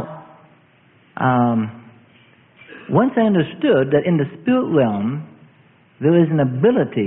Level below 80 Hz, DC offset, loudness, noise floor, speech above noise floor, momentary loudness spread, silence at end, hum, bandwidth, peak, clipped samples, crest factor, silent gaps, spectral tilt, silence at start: -58 dBFS; under 0.1%; -18 LUFS; -53 dBFS; 37 dB; 14 LU; 0 s; none; 3.9 kHz; -2 dBFS; under 0.1%; 18 dB; none; -12.5 dB/octave; 0 s